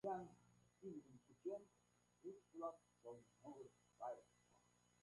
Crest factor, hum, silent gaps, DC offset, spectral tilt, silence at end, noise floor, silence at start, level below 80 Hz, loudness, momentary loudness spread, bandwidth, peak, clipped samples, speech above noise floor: 20 dB; 60 Hz at -80 dBFS; none; under 0.1%; -7 dB/octave; 0.45 s; -78 dBFS; 0.05 s; -90 dBFS; -57 LUFS; 9 LU; 11 kHz; -36 dBFS; under 0.1%; 23 dB